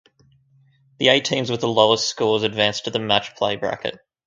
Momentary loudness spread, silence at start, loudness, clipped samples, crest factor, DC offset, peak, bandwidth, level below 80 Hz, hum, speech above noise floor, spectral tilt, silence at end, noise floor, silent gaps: 8 LU; 1 s; -20 LUFS; under 0.1%; 22 dB; under 0.1%; 0 dBFS; 9.2 kHz; -60 dBFS; none; 38 dB; -3.5 dB/octave; 0.3 s; -58 dBFS; none